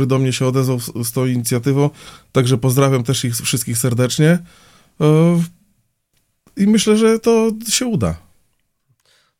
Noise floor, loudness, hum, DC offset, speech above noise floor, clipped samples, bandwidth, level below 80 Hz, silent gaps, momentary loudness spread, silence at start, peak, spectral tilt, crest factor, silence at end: -65 dBFS; -16 LUFS; none; under 0.1%; 50 dB; under 0.1%; 16.5 kHz; -48 dBFS; none; 7 LU; 0 s; 0 dBFS; -5.5 dB/octave; 16 dB; 1.2 s